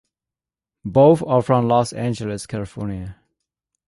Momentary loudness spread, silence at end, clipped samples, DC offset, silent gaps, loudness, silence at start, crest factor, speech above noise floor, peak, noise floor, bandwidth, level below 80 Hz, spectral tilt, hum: 17 LU; 0.75 s; under 0.1%; under 0.1%; none; -19 LUFS; 0.85 s; 18 dB; 71 dB; -2 dBFS; -89 dBFS; 11.5 kHz; -48 dBFS; -7.5 dB/octave; none